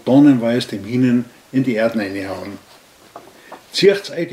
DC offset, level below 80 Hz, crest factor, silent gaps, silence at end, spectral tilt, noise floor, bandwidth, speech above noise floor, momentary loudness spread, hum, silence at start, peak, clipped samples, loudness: under 0.1%; -64 dBFS; 16 dB; none; 0 s; -6 dB/octave; -42 dBFS; 14.5 kHz; 26 dB; 15 LU; none; 0.05 s; 0 dBFS; under 0.1%; -17 LUFS